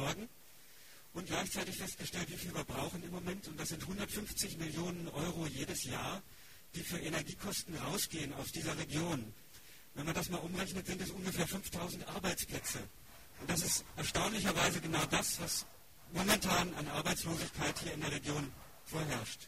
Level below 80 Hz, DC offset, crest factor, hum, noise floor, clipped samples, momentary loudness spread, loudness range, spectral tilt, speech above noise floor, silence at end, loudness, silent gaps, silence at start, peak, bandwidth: -58 dBFS; 0.1%; 24 dB; none; -61 dBFS; under 0.1%; 16 LU; 6 LU; -3 dB/octave; 22 dB; 0 s; -38 LUFS; none; 0 s; -16 dBFS; 15.5 kHz